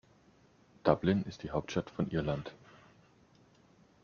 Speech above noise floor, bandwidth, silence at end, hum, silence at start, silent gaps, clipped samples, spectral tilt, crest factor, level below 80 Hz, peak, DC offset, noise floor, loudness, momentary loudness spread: 32 dB; 7 kHz; 1.5 s; none; 0.85 s; none; under 0.1%; -6.5 dB/octave; 26 dB; -60 dBFS; -10 dBFS; under 0.1%; -65 dBFS; -34 LUFS; 8 LU